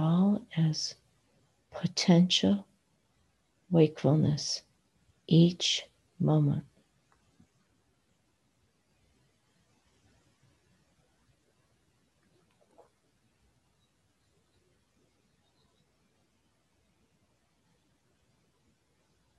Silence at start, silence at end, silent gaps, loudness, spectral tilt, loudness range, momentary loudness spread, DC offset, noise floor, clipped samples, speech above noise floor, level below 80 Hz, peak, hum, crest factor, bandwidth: 0 s; 12.75 s; none; -28 LUFS; -6 dB/octave; 7 LU; 12 LU; under 0.1%; -73 dBFS; under 0.1%; 47 dB; -66 dBFS; -10 dBFS; none; 22 dB; 10.5 kHz